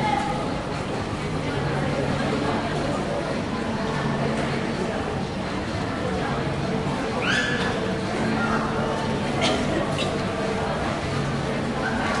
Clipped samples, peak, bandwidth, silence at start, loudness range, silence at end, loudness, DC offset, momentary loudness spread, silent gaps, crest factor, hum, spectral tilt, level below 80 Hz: under 0.1%; -10 dBFS; 11.5 kHz; 0 s; 2 LU; 0 s; -25 LUFS; under 0.1%; 5 LU; none; 16 dB; none; -5.5 dB/octave; -42 dBFS